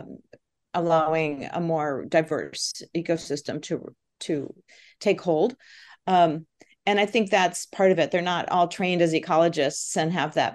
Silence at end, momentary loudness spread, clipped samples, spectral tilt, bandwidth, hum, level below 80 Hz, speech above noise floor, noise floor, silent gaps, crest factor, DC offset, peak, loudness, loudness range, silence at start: 0 s; 10 LU; under 0.1%; -4.5 dB/octave; 12.5 kHz; none; -70 dBFS; 33 dB; -57 dBFS; none; 18 dB; under 0.1%; -6 dBFS; -24 LUFS; 6 LU; 0 s